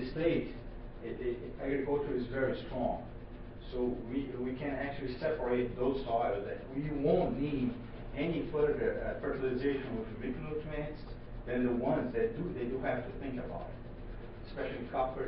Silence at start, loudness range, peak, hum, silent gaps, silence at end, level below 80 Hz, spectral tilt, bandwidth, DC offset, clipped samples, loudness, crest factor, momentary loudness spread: 0 s; 3 LU; -16 dBFS; none; none; 0 s; -48 dBFS; -6 dB/octave; 5.6 kHz; under 0.1%; under 0.1%; -36 LUFS; 18 dB; 14 LU